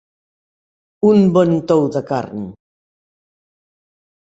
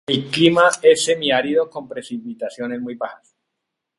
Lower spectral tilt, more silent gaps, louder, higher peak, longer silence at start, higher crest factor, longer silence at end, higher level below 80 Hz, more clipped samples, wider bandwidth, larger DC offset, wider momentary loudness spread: first, -8.5 dB/octave vs -4 dB/octave; neither; first, -15 LUFS vs -18 LUFS; about the same, -2 dBFS vs 0 dBFS; first, 1.05 s vs 0.1 s; about the same, 18 dB vs 20 dB; first, 1.7 s vs 0.85 s; about the same, -58 dBFS vs -62 dBFS; neither; second, 8 kHz vs 11.5 kHz; neither; about the same, 16 LU vs 16 LU